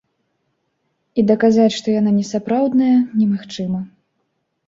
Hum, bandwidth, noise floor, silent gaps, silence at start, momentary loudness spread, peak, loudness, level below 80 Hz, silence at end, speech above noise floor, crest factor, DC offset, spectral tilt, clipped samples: none; 7.8 kHz; -70 dBFS; none; 1.15 s; 11 LU; -2 dBFS; -17 LUFS; -58 dBFS; 0.8 s; 55 dB; 16 dB; under 0.1%; -6.5 dB/octave; under 0.1%